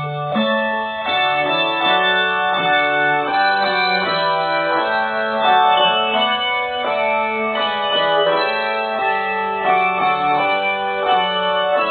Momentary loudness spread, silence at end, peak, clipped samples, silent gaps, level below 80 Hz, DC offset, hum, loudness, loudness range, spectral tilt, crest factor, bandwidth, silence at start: 5 LU; 0 s; -2 dBFS; under 0.1%; none; -58 dBFS; under 0.1%; none; -17 LUFS; 2 LU; -7.5 dB/octave; 14 dB; 4.7 kHz; 0 s